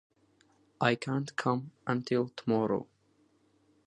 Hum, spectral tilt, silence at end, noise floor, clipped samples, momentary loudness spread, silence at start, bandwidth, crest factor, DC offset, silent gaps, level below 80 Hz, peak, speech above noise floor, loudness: none; -6.5 dB/octave; 1.05 s; -69 dBFS; under 0.1%; 5 LU; 0.8 s; 11 kHz; 24 dB; under 0.1%; none; -74 dBFS; -10 dBFS; 38 dB; -32 LUFS